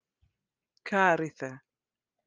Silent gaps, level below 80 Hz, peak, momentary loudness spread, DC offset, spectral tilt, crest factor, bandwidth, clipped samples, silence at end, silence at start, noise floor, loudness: none; -80 dBFS; -10 dBFS; 17 LU; under 0.1%; -5.5 dB/octave; 22 dB; 9.8 kHz; under 0.1%; 0.7 s; 0.85 s; under -90 dBFS; -27 LUFS